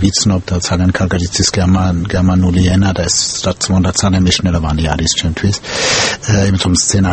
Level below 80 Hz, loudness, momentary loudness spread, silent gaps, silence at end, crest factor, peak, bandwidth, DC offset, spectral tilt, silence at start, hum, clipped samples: -28 dBFS; -13 LUFS; 4 LU; none; 0 s; 12 dB; 0 dBFS; 8.8 kHz; under 0.1%; -4 dB/octave; 0 s; none; under 0.1%